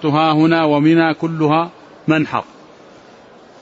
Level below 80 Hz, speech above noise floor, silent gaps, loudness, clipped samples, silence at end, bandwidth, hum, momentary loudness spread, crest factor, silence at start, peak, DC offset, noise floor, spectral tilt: -60 dBFS; 28 dB; none; -15 LUFS; under 0.1%; 1.2 s; 7.6 kHz; none; 13 LU; 14 dB; 0 s; -2 dBFS; under 0.1%; -43 dBFS; -7.5 dB/octave